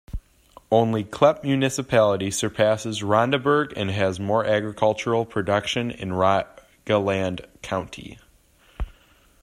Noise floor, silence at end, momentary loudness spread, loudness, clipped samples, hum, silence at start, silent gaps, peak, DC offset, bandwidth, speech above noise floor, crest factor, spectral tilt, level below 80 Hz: -57 dBFS; 0.5 s; 17 LU; -22 LUFS; under 0.1%; none; 0.1 s; none; -4 dBFS; under 0.1%; 15 kHz; 35 dB; 20 dB; -5 dB/octave; -44 dBFS